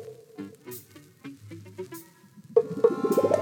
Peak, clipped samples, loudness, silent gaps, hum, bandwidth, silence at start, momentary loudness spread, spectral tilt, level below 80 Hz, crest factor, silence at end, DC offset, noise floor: -8 dBFS; under 0.1%; -25 LUFS; none; none; 18.5 kHz; 0 s; 22 LU; -6.5 dB/octave; -76 dBFS; 22 dB; 0 s; under 0.1%; -52 dBFS